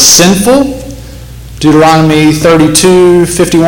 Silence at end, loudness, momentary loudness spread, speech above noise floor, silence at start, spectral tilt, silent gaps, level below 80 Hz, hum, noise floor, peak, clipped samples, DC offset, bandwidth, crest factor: 0 s; -5 LUFS; 12 LU; 20 dB; 0 s; -4 dB/octave; none; -28 dBFS; none; -25 dBFS; 0 dBFS; 1%; under 0.1%; over 20 kHz; 6 dB